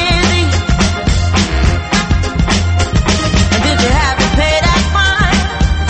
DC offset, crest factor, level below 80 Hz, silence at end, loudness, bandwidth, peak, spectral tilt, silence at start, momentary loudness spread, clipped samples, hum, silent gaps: under 0.1%; 12 dB; -16 dBFS; 0 s; -12 LUFS; 8.8 kHz; 0 dBFS; -4.5 dB/octave; 0 s; 3 LU; under 0.1%; none; none